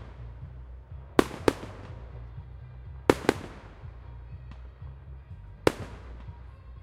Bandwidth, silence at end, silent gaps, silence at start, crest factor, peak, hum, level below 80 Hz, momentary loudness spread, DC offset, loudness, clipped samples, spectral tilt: 16 kHz; 0 s; none; 0 s; 32 dB; 0 dBFS; none; -46 dBFS; 20 LU; under 0.1%; -29 LUFS; under 0.1%; -5.5 dB/octave